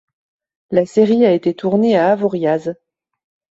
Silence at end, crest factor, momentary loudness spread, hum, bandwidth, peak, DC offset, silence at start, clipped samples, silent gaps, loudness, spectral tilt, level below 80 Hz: 0.85 s; 16 dB; 7 LU; none; 8 kHz; 0 dBFS; under 0.1%; 0.7 s; under 0.1%; none; -15 LUFS; -7.5 dB/octave; -60 dBFS